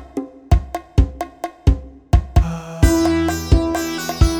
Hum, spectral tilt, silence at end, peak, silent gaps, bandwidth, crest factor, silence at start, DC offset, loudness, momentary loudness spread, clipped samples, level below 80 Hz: none; -6 dB/octave; 0 s; 0 dBFS; none; over 20 kHz; 16 dB; 0 s; under 0.1%; -19 LUFS; 10 LU; under 0.1%; -20 dBFS